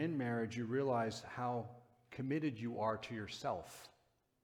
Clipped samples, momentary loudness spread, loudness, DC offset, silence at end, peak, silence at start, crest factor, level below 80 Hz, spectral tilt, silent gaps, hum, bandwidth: under 0.1%; 17 LU; -41 LUFS; under 0.1%; 0.55 s; -24 dBFS; 0 s; 16 dB; -76 dBFS; -6.5 dB/octave; none; none; 17.5 kHz